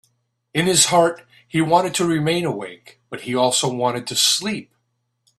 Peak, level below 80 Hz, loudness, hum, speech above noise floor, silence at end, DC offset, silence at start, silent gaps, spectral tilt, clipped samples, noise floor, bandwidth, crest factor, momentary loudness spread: -2 dBFS; -60 dBFS; -18 LUFS; none; 52 dB; 0.75 s; under 0.1%; 0.55 s; none; -3 dB/octave; under 0.1%; -72 dBFS; 14 kHz; 18 dB; 16 LU